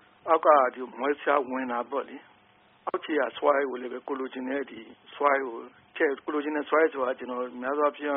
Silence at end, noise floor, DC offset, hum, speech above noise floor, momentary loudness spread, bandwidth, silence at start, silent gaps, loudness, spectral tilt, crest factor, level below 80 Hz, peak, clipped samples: 0 s; -60 dBFS; under 0.1%; none; 33 dB; 15 LU; 3.8 kHz; 0.25 s; none; -27 LUFS; 3 dB/octave; 22 dB; -78 dBFS; -6 dBFS; under 0.1%